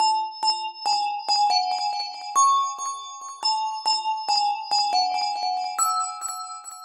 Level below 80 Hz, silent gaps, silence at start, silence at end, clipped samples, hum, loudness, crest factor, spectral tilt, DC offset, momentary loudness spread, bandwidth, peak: -86 dBFS; none; 0 s; 0 s; under 0.1%; none; -23 LUFS; 16 dB; 3.5 dB/octave; under 0.1%; 11 LU; 16.5 kHz; -8 dBFS